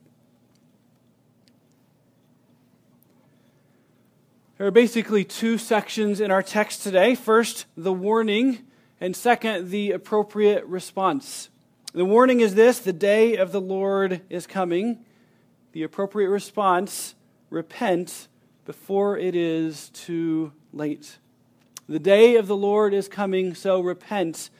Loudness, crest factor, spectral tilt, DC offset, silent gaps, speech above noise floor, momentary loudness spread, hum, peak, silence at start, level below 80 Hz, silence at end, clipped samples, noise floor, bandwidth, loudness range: -22 LUFS; 20 dB; -5 dB/octave; under 0.1%; none; 39 dB; 16 LU; none; -2 dBFS; 4.6 s; -78 dBFS; 0.1 s; under 0.1%; -61 dBFS; 16 kHz; 7 LU